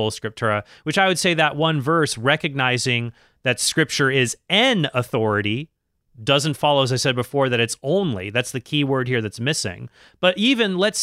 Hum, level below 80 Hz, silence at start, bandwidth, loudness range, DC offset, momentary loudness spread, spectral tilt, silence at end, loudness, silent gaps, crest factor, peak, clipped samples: none; -58 dBFS; 0 s; 16 kHz; 2 LU; under 0.1%; 7 LU; -4 dB/octave; 0 s; -20 LUFS; none; 18 dB; -2 dBFS; under 0.1%